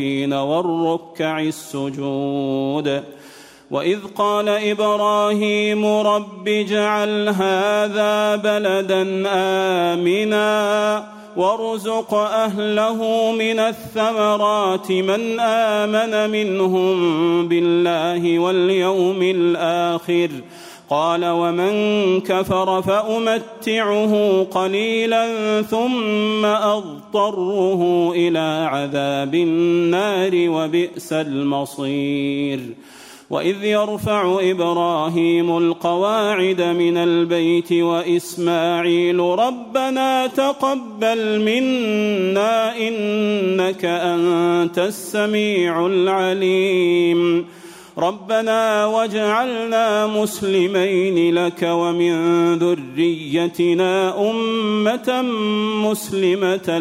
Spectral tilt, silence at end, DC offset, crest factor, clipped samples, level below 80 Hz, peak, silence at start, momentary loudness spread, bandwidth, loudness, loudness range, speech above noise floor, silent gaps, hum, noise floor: -5.5 dB/octave; 0 s; under 0.1%; 12 dB; under 0.1%; -62 dBFS; -6 dBFS; 0 s; 5 LU; 16 kHz; -18 LUFS; 2 LU; 24 dB; none; none; -42 dBFS